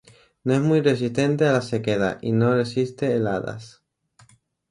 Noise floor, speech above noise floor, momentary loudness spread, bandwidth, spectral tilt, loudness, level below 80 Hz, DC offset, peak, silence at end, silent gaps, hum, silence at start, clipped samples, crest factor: -57 dBFS; 36 dB; 8 LU; 11.5 kHz; -7 dB/octave; -22 LUFS; -58 dBFS; under 0.1%; -4 dBFS; 1.05 s; none; none; 0.45 s; under 0.1%; 18 dB